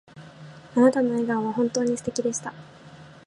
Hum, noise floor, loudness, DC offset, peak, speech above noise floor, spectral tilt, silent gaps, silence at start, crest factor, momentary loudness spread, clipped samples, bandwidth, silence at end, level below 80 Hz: none; -47 dBFS; -24 LUFS; under 0.1%; -6 dBFS; 23 dB; -5 dB/octave; none; 0.15 s; 18 dB; 23 LU; under 0.1%; 11.5 kHz; 0.15 s; -66 dBFS